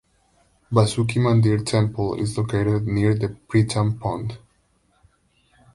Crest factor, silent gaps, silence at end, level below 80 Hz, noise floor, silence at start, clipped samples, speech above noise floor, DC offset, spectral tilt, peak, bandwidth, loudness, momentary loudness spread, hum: 18 dB; none; 1.4 s; -46 dBFS; -64 dBFS; 0.7 s; under 0.1%; 43 dB; under 0.1%; -7 dB/octave; -4 dBFS; 11.5 kHz; -22 LUFS; 8 LU; none